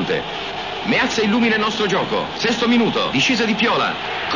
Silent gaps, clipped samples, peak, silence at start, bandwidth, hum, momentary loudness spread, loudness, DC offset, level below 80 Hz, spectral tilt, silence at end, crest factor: none; under 0.1%; -6 dBFS; 0 s; 7.4 kHz; none; 7 LU; -18 LUFS; 0.3%; -50 dBFS; -4 dB/octave; 0 s; 12 dB